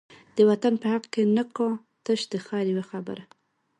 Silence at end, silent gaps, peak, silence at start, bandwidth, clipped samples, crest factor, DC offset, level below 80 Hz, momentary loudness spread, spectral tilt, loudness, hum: 0.55 s; none; -8 dBFS; 0.35 s; 11 kHz; under 0.1%; 18 dB; under 0.1%; -74 dBFS; 14 LU; -6 dB/octave; -26 LUFS; none